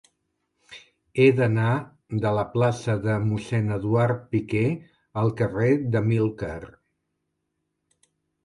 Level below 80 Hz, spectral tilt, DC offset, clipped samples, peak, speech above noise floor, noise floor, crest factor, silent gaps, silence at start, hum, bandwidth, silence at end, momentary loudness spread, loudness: -54 dBFS; -8 dB/octave; under 0.1%; under 0.1%; -6 dBFS; 55 dB; -78 dBFS; 18 dB; none; 0.7 s; none; 11 kHz; 1.8 s; 12 LU; -24 LUFS